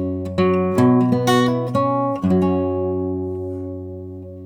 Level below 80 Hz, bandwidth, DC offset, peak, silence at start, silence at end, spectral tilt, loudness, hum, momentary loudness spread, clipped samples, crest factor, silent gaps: -52 dBFS; 18.5 kHz; under 0.1%; -4 dBFS; 0 s; 0 s; -7 dB/octave; -19 LUFS; none; 15 LU; under 0.1%; 14 dB; none